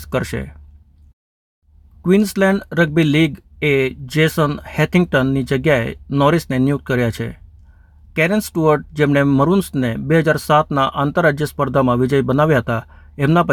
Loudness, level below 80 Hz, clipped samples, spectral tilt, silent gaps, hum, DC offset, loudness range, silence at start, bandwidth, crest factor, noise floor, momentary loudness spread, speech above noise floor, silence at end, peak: -17 LUFS; -42 dBFS; under 0.1%; -6.5 dB/octave; 1.13-1.62 s; none; under 0.1%; 3 LU; 0 s; 19.5 kHz; 16 dB; -45 dBFS; 7 LU; 29 dB; 0 s; -2 dBFS